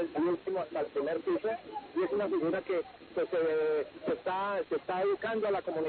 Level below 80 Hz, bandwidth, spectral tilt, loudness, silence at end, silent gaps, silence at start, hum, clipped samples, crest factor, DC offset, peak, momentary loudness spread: -70 dBFS; 4.5 kHz; -4 dB/octave; -33 LUFS; 0 s; none; 0 s; none; under 0.1%; 10 dB; under 0.1%; -22 dBFS; 5 LU